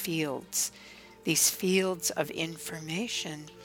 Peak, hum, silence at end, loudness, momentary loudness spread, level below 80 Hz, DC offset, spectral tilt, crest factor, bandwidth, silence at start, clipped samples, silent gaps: -12 dBFS; none; 0 s; -30 LUFS; 14 LU; -68 dBFS; under 0.1%; -2.5 dB/octave; 20 dB; 19 kHz; 0 s; under 0.1%; none